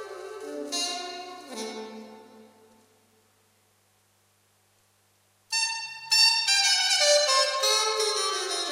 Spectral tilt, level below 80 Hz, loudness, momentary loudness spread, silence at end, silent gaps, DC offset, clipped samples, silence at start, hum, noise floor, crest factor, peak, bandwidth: 2 dB/octave; -88 dBFS; -22 LUFS; 20 LU; 0 s; none; under 0.1%; under 0.1%; 0 s; 50 Hz at -75 dBFS; -66 dBFS; 20 dB; -8 dBFS; 16 kHz